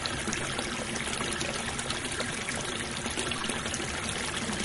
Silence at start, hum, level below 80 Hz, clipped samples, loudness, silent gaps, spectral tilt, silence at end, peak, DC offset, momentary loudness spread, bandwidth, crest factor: 0 s; none; -48 dBFS; under 0.1%; -31 LUFS; none; -2.5 dB/octave; 0 s; -10 dBFS; under 0.1%; 1 LU; 11.5 kHz; 22 dB